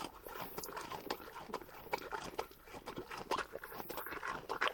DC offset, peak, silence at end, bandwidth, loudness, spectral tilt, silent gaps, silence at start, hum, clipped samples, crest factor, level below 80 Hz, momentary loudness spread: under 0.1%; -16 dBFS; 0 s; 19 kHz; -44 LUFS; -3 dB/octave; none; 0 s; none; under 0.1%; 28 dB; -66 dBFS; 7 LU